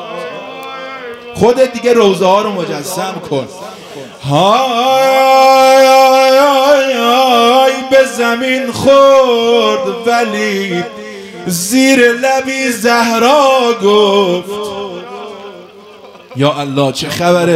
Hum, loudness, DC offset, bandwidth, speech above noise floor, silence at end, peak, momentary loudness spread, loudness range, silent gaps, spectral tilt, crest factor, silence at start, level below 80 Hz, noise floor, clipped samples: none; -10 LUFS; under 0.1%; 16 kHz; 25 dB; 0 s; 0 dBFS; 19 LU; 6 LU; none; -4 dB/octave; 10 dB; 0 s; -54 dBFS; -35 dBFS; 0.7%